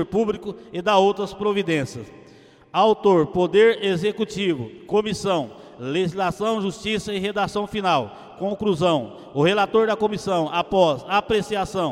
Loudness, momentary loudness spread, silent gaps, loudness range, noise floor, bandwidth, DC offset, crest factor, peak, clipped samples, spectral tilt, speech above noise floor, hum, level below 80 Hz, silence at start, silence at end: -22 LUFS; 10 LU; none; 4 LU; -49 dBFS; 12.5 kHz; under 0.1%; 18 dB; -4 dBFS; under 0.1%; -5.5 dB/octave; 28 dB; none; -52 dBFS; 0 s; 0 s